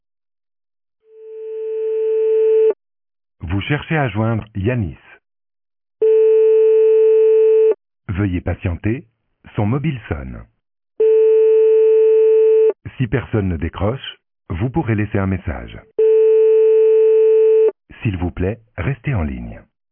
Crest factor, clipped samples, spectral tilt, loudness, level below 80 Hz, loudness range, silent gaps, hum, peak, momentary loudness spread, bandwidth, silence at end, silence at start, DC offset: 10 dB; under 0.1%; -12 dB/octave; -16 LUFS; -38 dBFS; 7 LU; none; none; -6 dBFS; 15 LU; 3.5 kHz; 0.35 s; 1.2 s; under 0.1%